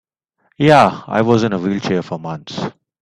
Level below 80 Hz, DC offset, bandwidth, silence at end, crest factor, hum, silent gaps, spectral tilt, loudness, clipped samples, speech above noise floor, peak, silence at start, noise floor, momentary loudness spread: -52 dBFS; under 0.1%; 12 kHz; 0.3 s; 16 dB; none; none; -6.5 dB/octave; -16 LUFS; under 0.1%; 48 dB; 0 dBFS; 0.6 s; -64 dBFS; 15 LU